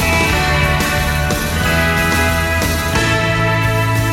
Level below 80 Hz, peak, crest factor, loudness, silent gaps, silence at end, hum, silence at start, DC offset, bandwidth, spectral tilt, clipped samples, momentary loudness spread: -26 dBFS; 0 dBFS; 14 dB; -15 LUFS; none; 0 s; none; 0 s; under 0.1%; 17 kHz; -4.5 dB/octave; under 0.1%; 2 LU